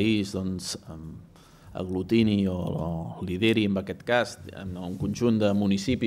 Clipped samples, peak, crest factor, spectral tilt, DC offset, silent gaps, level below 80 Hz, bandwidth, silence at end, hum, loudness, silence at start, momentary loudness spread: under 0.1%; -10 dBFS; 16 dB; -6 dB/octave; under 0.1%; none; -52 dBFS; 15 kHz; 0 s; none; -27 LUFS; 0 s; 15 LU